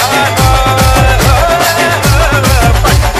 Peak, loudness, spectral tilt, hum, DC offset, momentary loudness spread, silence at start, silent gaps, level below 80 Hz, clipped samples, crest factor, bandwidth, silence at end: 0 dBFS; -8 LUFS; -4 dB/octave; none; under 0.1%; 1 LU; 0 s; none; -14 dBFS; under 0.1%; 8 dB; 16 kHz; 0 s